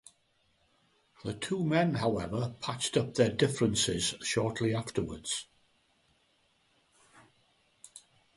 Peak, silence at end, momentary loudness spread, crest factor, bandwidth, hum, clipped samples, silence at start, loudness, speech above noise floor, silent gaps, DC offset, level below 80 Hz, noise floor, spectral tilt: -12 dBFS; 0.4 s; 11 LU; 22 dB; 11.5 kHz; none; under 0.1%; 1.25 s; -31 LUFS; 41 dB; none; under 0.1%; -60 dBFS; -72 dBFS; -4.5 dB/octave